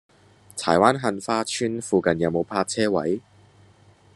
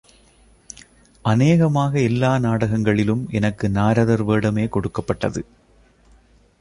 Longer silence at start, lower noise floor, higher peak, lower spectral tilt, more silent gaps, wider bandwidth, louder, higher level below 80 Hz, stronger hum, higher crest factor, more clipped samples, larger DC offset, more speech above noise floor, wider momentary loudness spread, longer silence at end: second, 0.55 s vs 1.25 s; about the same, -54 dBFS vs -54 dBFS; first, 0 dBFS vs -4 dBFS; second, -4.5 dB/octave vs -7.5 dB/octave; neither; first, 12.5 kHz vs 10.5 kHz; second, -23 LUFS vs -19 LUFS; second, -62 dBFS vs -44 dBFS; neither; first, 24 dB vs 16 dB; neither; neither; second, 32 dB vs 36 dB; second, 10 LU vs 16 LU; second, 0.95 s vs 1.2 s